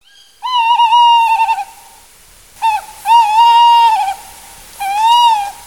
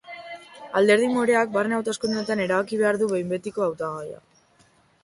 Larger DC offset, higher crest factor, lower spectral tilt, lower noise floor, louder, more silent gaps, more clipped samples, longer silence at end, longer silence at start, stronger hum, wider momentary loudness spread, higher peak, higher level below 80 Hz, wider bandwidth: first, 0.2% vs under 0.1%; second, 12 dB vs 18 dB; second, 2 dB/octave vs -5 dB/octave; second, -43 dBFS vs -60 dBFS; first, -10 LUFS vs -23 LUFS; neither; neither; second, 0.15 s vs 0.9 s; first, 0.45 s vs 0.05 s; neither; second, 13 LU vs 19 LU; first, 0 dBFS vs -8 dBFS; first, -52 dBFS vs -66 dBFS; first, 18 kHz vs 11.5 kHz